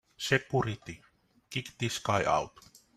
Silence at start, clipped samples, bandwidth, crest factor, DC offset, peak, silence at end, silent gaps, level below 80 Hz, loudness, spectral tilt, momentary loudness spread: 0.2 s; under 0.1%; 15.5 kHz; 22 dB; under 0.1%; -10 dBFS; 0.5 s; none; -60 dBFS; -31 LUFS; -4.5 dB/octave; 15 LU